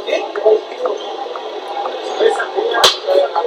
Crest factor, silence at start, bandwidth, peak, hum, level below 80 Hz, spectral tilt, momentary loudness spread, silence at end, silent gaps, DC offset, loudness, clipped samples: 16 dB; 0 s; 16 kHz; 0 dBFS; none; -62 dBFS; -0.5 dB/octave; 13 LU; 0 s; none; under 0.1%; -16 LUFS; under 0.1%